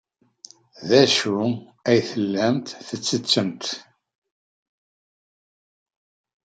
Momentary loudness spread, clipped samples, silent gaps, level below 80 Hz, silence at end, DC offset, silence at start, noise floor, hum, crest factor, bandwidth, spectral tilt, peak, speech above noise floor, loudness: 13 LU; under 0.1%; none; -70 dBFS; 2.65 s; under 0.1%; 0.8 s; -49 dBFS; none; 22 dB; 9.4 kHz; -4 dB/octave; -2 dBFS; 28 dB; -21 LUFS